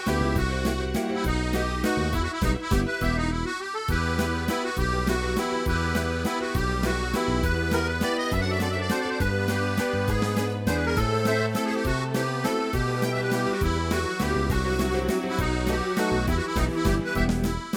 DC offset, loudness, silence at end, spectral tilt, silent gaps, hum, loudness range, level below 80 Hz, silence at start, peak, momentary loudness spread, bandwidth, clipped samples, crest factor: under 0.1%; -26 LUFS; 0 s; -5.5 dB/octave; none; none; 1 LU; -32 dBFS; 0 s; -10 dBFS; 2 LU; 19.5 kHz; under 0.1%; 16 dB